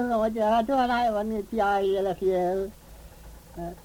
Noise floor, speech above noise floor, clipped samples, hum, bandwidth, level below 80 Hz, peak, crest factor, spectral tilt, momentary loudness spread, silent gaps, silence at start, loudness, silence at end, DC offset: -46 dBFS; 21 dB; under 0.1%; none; 18.5 kHz; -48 dBFS; -12 dBFS; 14 dB; -6 dB/octave; 14 LU; none; 0 s; -25 LUFS; 0.05 s; under 0.1%